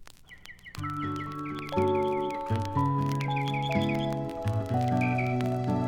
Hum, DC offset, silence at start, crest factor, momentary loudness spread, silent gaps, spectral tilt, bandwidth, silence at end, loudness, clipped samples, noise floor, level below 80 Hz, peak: none; under 0.1%; 0 s; 14 dB; 9 LU; none; -7.5 dB/octave; 16.5 kHz; 0 s; -29 LUFS; under 0.1%; -49 dBFS; -56 dBFS; -14 dBFS